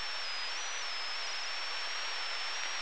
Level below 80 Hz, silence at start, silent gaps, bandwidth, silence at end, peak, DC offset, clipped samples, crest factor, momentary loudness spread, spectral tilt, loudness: -86 dBFS; 0 s; none; 11 kHz; 0 s; -22 dBFS; 0.9%; under 0.1%; 18 dB; 1 LU; 1.5 dB/octave; -36 LUFS